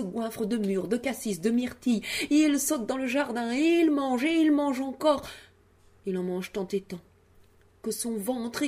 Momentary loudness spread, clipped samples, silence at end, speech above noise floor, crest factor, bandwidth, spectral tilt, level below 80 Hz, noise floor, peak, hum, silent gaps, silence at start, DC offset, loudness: 11 LU; under 0.1%; 0 s; 32 dB; 16 dB; 15.5 kHz; -4.5 dB/octave; -62 dBFS; -59 dBFS; -10 dBFS; none; none; 0 s; under 0.1%; -27 LUFS